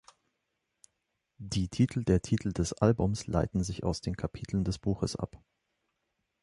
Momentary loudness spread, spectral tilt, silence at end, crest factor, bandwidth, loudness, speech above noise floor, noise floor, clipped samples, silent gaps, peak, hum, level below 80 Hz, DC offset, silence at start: 9 LU; -6.5 dB/octave; 1.05 s; 22 dB; 11.5 kHz; -31 LUFS; 52 dB; -82 dBFS; under 0.1%; none; -10 dBFS; none; -46 dBFS; under 0.1%; 1.4 s